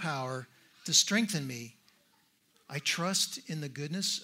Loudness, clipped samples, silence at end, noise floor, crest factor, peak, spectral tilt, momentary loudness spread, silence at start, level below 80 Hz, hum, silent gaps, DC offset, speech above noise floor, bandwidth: -30 LUFS; under 0.1%; 0 s; -70 dBFS; 24 dB; -10 dBFS; -2.5 dB/octave; 17 LU; 0 s; -80 dBFS; none; none; under 0.1%; 37 dB; 16 kHz